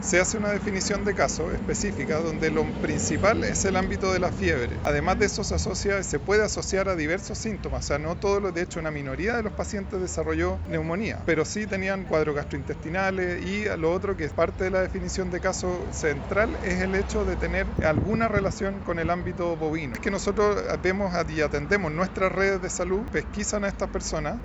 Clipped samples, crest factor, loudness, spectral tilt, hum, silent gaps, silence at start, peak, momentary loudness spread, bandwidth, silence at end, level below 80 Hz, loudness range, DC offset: under 0.1%; 20 dB; -26 LUFS; -5 dB/octave; none; none; 0 s; -6 dBFS; 5 LU; 8.2 kHz; 0 s; -38 dBFS; 3 LU; under 0.1%